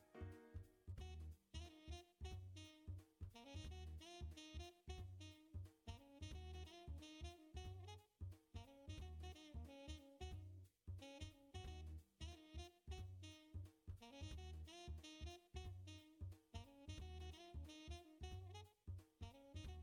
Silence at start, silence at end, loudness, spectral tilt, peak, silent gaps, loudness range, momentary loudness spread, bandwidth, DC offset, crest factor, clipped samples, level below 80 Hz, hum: 0 s; 0 s; -58 LUFS; -5 dB/octave; -40 dBFS; none; 1 LU; 4 LU; 17 kHz; under 0.1%; 16 dB; under 0.1%; -62 dBFS; none